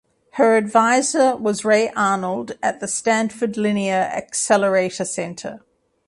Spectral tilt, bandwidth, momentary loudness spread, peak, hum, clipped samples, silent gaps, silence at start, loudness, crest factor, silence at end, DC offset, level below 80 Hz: -4 dB/octave; 11.5 kHz; 10 LU; -2 dBFS; none; under 0.1%; none; 0.35 s; -19 LUFS; 18 dB; 0.5 s; under 0.1%; -64 dBFS